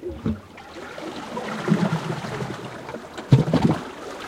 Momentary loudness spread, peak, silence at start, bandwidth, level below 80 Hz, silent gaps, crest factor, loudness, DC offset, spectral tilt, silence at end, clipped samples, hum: 16 LU; -2 dBFS; 0 s; 13.5 kHz; -48 dBFS; none; 22 dB; -25 LUFS; under 0.1%; -7 dB/octave; 0 s; under 0.1%; none